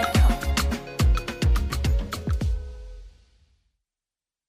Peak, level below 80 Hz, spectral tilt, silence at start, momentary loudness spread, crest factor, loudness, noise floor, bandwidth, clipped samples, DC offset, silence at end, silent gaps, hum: -10 dBFS; -26 dBFS; -5.5 dB/octave; 0 s; 13 LU; 16 dB; -25 LUFS; under -90 dBFS; 16 kHz; under 0.1%; under 0.1%; 1.4 s; none; none